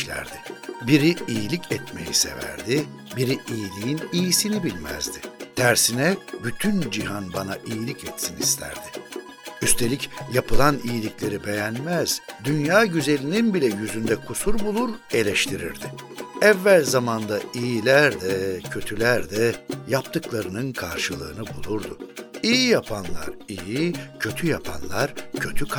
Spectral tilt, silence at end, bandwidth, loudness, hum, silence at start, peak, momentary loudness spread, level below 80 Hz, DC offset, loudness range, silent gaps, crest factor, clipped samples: -4 dB/octave; 0 s; 19.5 kHz; -23 LUFS; none; 0 s; -2 dBFS; 14 LU; -40 dBFS; under 0.1%; 5 LU; none; 22 dB; under 0.1%